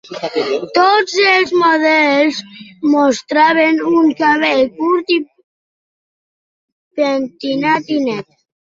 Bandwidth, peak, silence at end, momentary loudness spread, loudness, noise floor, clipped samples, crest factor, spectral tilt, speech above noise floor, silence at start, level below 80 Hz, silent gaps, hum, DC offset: 7.6 kHz; 0 dBFS; 0.45 s; 9 LU; -14 LUFS; under -90 dBFS; under 0.1%; 14 dB; -4 dB/octave; over 76 dB; 0.1 s; -62 dBFS; 5.44-6.91 s; none; under 0.1%